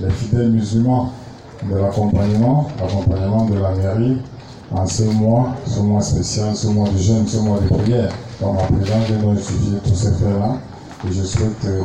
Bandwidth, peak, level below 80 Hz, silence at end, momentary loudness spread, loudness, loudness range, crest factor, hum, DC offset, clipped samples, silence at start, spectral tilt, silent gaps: 9.4 kHz; -4 dBFS; -36 dBFS; 0 s; 8 LU; -18 LUFS; 1 LU; 12 dB; none; under 0.1%; under 0.1%; 0 s; -7 dB/octave; none